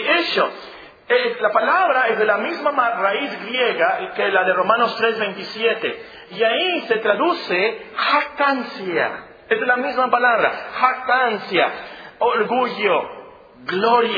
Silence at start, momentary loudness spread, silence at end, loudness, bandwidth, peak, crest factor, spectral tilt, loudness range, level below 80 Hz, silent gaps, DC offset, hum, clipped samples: 0 s; 8 LU; 0 s; -19 LUFS; 5 kHz; 0 dBFS; 18 dB; -5.5 dB/octave; 2 LU; -64 dBFS; none; under 0.1%; none; under 0.1%